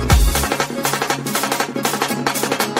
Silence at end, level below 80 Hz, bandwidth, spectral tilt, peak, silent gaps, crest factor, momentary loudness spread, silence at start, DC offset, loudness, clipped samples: 0 s; -24 dBFS; 16.5 kHz; -3.5 dB/octave; 0 dBFS; none; 18 dB; 4 LU; 0 s; under 0.1%; -19 LUFS; under 0.1%